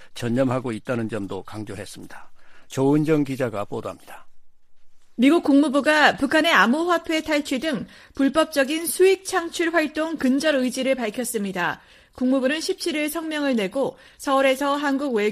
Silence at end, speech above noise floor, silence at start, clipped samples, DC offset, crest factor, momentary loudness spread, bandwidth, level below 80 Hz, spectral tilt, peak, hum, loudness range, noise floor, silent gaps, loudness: 0 s; 20 dB; 0 s; under 0.1%; under 0.1%; 18 dB; 15 LU; 15.5 kHz; -56 dBFS; -4.5 dB/octave; -4 dBFS; none; 7 LU; -41 dBFS; none; -21 LUFS